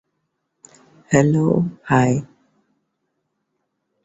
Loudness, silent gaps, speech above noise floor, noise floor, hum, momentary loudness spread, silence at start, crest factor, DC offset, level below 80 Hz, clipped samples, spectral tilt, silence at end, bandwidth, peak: -18 LUFS; none; 57 dB; -74 dBFS; none; 5 LU; 1.1 s; 20 dB; under 0.1%; -54 dBFS; under 0.1%; -7 dB/octave; 1.8 s; 8 kHz; -2 dBFS